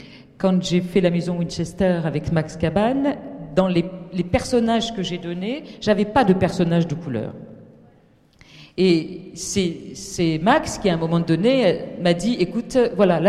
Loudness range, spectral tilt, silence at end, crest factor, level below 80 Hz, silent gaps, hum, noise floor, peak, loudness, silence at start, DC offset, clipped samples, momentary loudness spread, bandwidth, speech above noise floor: 4 LU; -6 dB/octave; 0 s; 16 dB; -46 dBFS; none; none; -55 dBFS; -4 dBFS; -21 LUFS; 0 s; under 0.1%; under 0.1%; 10 LU; 12.5 kHz; 35 dB